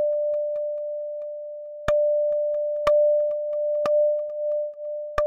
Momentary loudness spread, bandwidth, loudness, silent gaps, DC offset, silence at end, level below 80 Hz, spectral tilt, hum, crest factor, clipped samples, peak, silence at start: 12 LU; 7.2 kHz; -24 LUFS; none; under 0.1%; 0 s; -52 dBFS; -5 dB/octave; none; 16 dB; under 0.1%; -8 dBFS; 0 s